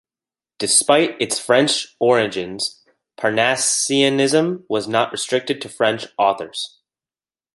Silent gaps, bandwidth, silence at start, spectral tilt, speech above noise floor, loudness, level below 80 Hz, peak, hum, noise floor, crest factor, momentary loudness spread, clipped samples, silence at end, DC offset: none; 12 kHz; 0.6 s; -2.5 dB/octave; over 71 dB; -18 LUFS; -64 dBFS; 0 dBFS; none; under -90 dBFS; 18 dB; 10 LU; under 0.1%; 0.85 s; under 0.1%